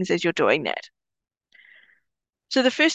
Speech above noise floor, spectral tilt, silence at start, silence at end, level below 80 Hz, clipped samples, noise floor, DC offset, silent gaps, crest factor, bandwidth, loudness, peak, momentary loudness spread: 59 dB; -4 dB/octave; 0 s; 0 s; -72 dBFS; under 0.1%; -81 dBFS; under 0.1%; none; 20 dB; 8.8 kHz; -22 LUFS; -6 dBFS; 9 LU